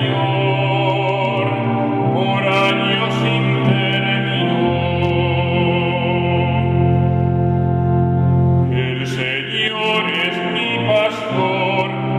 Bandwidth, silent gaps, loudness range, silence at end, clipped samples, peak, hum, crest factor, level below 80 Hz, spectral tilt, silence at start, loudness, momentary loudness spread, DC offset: 8 kHz; none; 1 LU; 0 s; under 0.1%; -2 dBFS; none; 14 dB; -40 dBFS; -7 dB/octave; 0 s; -17 LUFS; 3 LU; under 0.1%